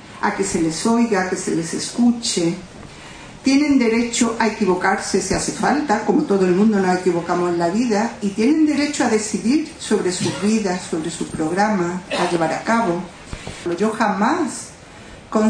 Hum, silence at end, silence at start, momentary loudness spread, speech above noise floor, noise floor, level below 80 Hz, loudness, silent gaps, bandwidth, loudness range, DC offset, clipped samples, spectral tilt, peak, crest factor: none; 0 s; 0 s; 11 LU; 21 dB; -40 dBFS; -48 dBFS; -19 LUFS; none; 10 kHz; 3 LU; under 0.1%; under 0.1%; -4.5 dB/octave; -2 dBFS; 16 dB